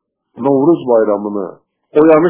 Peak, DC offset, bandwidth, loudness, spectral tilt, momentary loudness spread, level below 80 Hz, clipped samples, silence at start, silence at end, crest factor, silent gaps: 0 dBFS; under 0.1%; 4 kHz; -13 LUFS; -12 dB/octave; 11 LU; -54 dBFS; under 0.1%; 0.35 s; 0 s; 12 dB; none